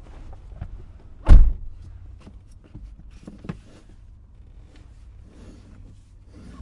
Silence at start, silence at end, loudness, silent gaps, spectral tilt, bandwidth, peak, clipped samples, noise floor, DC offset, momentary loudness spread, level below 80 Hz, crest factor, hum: 1.25 s; 4.95 s; -21 LUFS; none; -8 dB/octave; 3.8 kHz; 0 dBFS; under 0.1%; -47 dBFS; under 0.1%; 30 LU; -22 dBFS; 22 dB; none